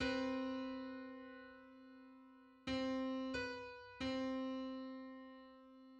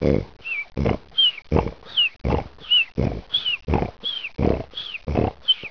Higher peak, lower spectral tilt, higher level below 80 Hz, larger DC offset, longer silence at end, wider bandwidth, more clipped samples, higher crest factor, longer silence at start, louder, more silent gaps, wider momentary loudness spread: second, -28 dBFS vs -4 dBFS; second, -5 dB/octave vs -6.5 dB/octave; second, -68 dBFS vs -34 dBFS; second, under 0.1% vs 0.4%; about the same, 0 s vs 0 s; first, 8.6 kHz vs 5.4 kHz; neither; about the same, 16 dB vs 20 dB; about the same, 0 s vs 0 s; second, -45 LUFS vs -22 LUFS; neither; first, 19 LU vs 9 LU